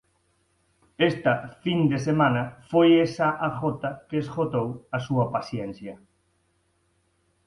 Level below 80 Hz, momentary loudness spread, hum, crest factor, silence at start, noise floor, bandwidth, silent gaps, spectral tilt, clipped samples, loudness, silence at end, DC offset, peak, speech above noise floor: -60 dBFS; 13 LU; none; 20 dB; 1 s; -69 dBFS; 11 kHz; none; -7 dB/octave; under 0.1%; -25 LUFS; 1.5 s; under 0.1%; -6 dBFS; 45 dB